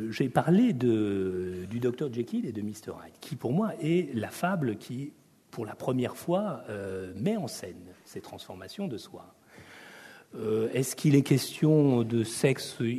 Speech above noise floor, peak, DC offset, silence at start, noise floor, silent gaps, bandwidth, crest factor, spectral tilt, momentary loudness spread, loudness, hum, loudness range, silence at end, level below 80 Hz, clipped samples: 22 dB; -10 dBFS; under 0.1%; 0 s; -51 dBFS; none; 13.5 kHz; 20 dB; -6.5 dB/octave; 20 LU; -29 LUFS; none; 10 LU; 0 s; -68 dBFS; under 0.1%